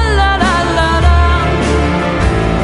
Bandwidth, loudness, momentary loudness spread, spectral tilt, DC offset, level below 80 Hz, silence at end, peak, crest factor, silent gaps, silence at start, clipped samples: 11 kHz; -12 LUFS; 3 LU; -6 dB/octave; under 0.1%; -16 dBFS; 0 s; 0 dBFS; 12 dB; none; 0 s; under 0.1%